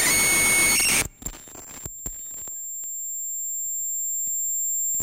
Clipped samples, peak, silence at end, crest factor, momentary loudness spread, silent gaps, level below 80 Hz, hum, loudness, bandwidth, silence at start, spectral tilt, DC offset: under 0.1%; -10 dBFS; 0 s; 16 dB; 19 LU; none; -48 dBFS; none; -22 LUFS; 17 kHz; 0 s; 0 dB/octave; 0.4%